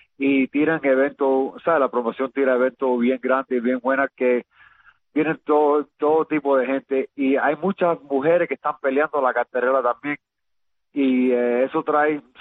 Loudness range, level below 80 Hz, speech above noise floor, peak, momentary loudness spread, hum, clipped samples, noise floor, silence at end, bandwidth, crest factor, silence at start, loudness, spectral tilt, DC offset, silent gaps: 2 LU; -68 dBFS; 60 dB; -6 dBFS; 5 LU; none; under 0.1%; -81 dBFS; 0.2 s; 4 kHz; 14 dB; 0.2 s; -21 LUFS; -9 dB/octave; under 0.1%; none